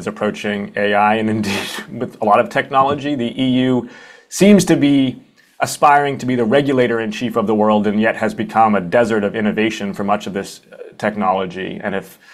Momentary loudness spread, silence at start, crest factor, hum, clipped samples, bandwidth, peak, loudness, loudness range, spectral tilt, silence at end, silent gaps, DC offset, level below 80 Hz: 12 LU; 0 s; 16 dB; none; under 0.1%; 15 kHz; 0 dBFS; -16 LUFS; 3 LU; -5.5 dB/octave; 0.2 s; none; under 0.1%; -54 dBFS